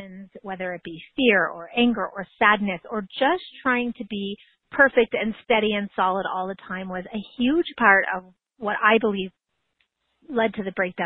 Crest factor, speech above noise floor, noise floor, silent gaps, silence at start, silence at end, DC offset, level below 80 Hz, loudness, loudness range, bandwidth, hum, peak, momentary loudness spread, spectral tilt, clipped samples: 22 dB; 49 dB; -72 dBFS; none; 0 s; 0 s; under 0.1%; -58 dBFS; -23 LUFS; 1 LU; 4.5 kHz; none; -2 dBFS; 14 LU; -9 dB/octave; under 0.1%